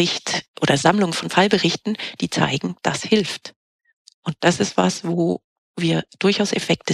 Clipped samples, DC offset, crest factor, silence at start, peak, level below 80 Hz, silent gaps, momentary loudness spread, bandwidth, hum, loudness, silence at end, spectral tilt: under 0.1%; under 0.1%; 20 dB; 0 s; -2 dBFS; -58 dBFS; 0.48-0.54 s, 3.56-3.79 s, 3.93-4.05 s, 4.14-4.23 s, 5.44-5.74 s; 10 LU; 13.5 kHz; none; -20 LUFS; 0 s; -4.5 dB/octave